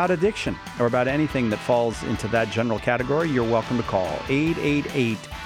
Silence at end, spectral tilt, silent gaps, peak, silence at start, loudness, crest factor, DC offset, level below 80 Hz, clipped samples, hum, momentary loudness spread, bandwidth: 0 s; -6 dB/octave; none; -8 dBFS; 0 s; -23 LUFS; 16 dB; under 0.1%; -44 dBFS; under 0.1%; none; 4 LU; 16 kHz